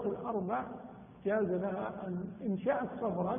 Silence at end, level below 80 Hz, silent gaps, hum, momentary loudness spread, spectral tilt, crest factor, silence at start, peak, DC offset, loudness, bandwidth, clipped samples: 0 s; -66 dBFS; none; none; 8 LU; -4.5 dB/octave; 14 dB; 0 s; -20 dBFS; under 0.1%; -36 LUFS; 3.6 kHz; under 0.1%